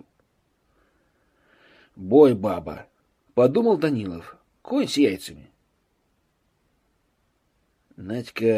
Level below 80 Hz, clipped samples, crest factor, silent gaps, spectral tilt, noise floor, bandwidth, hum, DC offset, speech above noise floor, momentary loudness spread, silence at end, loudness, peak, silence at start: -60 dBFS; under 0.1%; 22 dB; none; -6.5 dB/octave; -69 dBFS; 15 kHz; none; under 0.1%; 48 dB; 23 LU; 0 s; -22 LUFS; -2 dBFS; 2 s